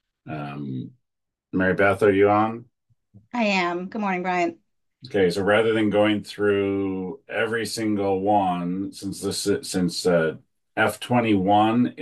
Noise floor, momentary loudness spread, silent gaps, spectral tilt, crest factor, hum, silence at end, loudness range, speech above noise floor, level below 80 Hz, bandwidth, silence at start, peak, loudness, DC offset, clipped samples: -82 dBFS; 13 LU; none; -5.5 dB/octave; 18 dB; none; 0 s; 2 LU; 60 dB; -54 dBFS; 12.5 kHz; 0.25 s; -6 dBFS; -23 LUFS; under 0.1%; under 0.1%